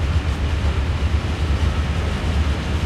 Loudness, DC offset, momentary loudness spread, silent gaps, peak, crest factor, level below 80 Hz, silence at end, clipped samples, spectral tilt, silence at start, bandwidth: -22 LUFS; under 0.1%; 2 LU; none; -8 dBFS; 12 dB; -22 dBFS; 0 s; under 0.1%; -6 dB/octave; 0 s; 11 kHz